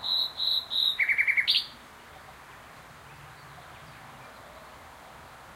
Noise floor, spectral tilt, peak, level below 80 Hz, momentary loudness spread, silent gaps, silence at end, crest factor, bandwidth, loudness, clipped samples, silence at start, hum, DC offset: -49 dBFS; -0.5 dB/octave; -10 dBFS; -64 dBFS; 25 LU; none; 0 s; 22 dB; 16 kHz; -24 LUFS; under 0.1%; 0 s; none; under 0.1%